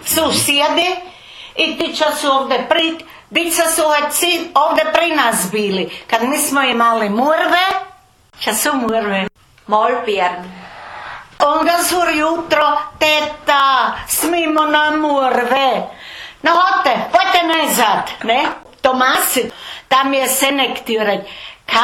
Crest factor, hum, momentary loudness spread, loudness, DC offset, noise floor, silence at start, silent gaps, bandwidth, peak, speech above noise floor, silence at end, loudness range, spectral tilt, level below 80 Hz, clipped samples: 16 dB; none; 11 LU; -15 LUFS; under 0.1%; -46 dBFS; 0 s; none; 17 kHz; 0 dBFS; 31 dB; 0 s; 3 LU; -2 dB/octave; -52 dBFS; under 0.1%